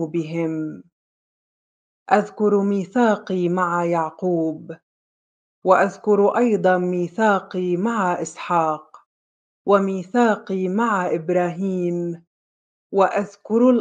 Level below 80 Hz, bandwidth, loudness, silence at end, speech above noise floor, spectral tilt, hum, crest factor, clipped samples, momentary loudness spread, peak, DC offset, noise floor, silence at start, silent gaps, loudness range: -72 dBFS; 9.4 kHz; -21 LUFS; 0 s; over 70 dB; -7 dB/octave; none; 20 dB; under 0.1%; 9 LU; -2 dBFS; under 0.1%; under -90 dBFS; 0 s; 0.92-2.06 s, 4.83-5.62 s, 9.06-9.65 s, 12.27-12.90 s; 3 LU